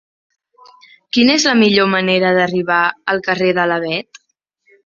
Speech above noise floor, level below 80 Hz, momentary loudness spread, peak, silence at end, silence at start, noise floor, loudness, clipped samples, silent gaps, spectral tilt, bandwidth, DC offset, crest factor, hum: 47 dB; -58 dBFS; 8 LU; 0 dBFS; 0.85 s; 1.15 s; -62 dBFS; -14 LUFS; under 0.1%; none; -4 dB/octave; 7.4 kHz; under 0.1%; 16 dB; none